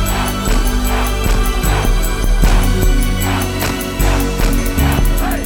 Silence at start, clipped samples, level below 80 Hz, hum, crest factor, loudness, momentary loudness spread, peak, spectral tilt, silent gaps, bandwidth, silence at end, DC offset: 0 s; under 0.1%; -14 dBFS; none; 12 dB; -16 LUFS; 3 LU; 0 dBFS; -4.5 dB/octave; none; over 20 kHz; 0 s; under 0.1%